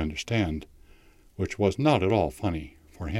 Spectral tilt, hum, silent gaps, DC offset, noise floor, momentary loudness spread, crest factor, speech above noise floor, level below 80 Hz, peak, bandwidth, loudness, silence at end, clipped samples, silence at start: -6.5 dB/octave; none; none; under 0.1%; -55 dBFS; 15 LU; 20 dB; 29 dB; -44 dBFS; -8 dBFS; 15 kHz; -27 LUFS; 0 s; under 0.1%; 0 s